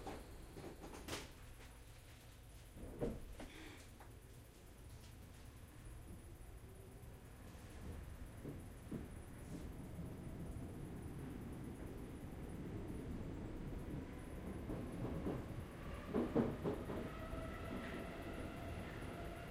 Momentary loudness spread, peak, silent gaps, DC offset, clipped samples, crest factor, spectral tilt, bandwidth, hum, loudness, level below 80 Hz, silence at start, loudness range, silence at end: 14 LU; -24 dBFS; none; under 0.1%; under 0.1%; 26 dB; -6.5 dB/octave; 16 kHz; none; -50 LUFS; -56 dBFS; 0 s; 13 LU; 0 s